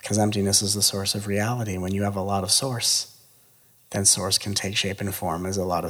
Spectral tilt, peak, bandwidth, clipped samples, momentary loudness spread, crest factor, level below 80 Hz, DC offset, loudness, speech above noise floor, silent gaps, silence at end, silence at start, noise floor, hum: -3 dB/octave; -4 dBFS; over 20 kHz; under 0.1%; 9 LU; 20 dB; -58 dBFS; under 0.1%; -23 LUFS; 33 dB; none; 0 s; 0.05 s; -57 dBFS; none